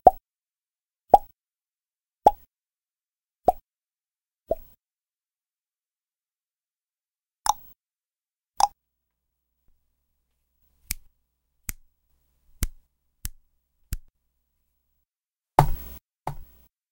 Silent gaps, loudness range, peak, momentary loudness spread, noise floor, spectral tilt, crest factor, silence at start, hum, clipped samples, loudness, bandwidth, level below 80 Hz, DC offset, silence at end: none; 16 LU; 0 dBFS; 20 LU; under -90 dBFS; -4.5 dB/octave; 30 dB; 0.05 s; none; under 0.1%; -26 LUFS; 16 kHz; -42 dBFS; under 0.1%; 0.5 s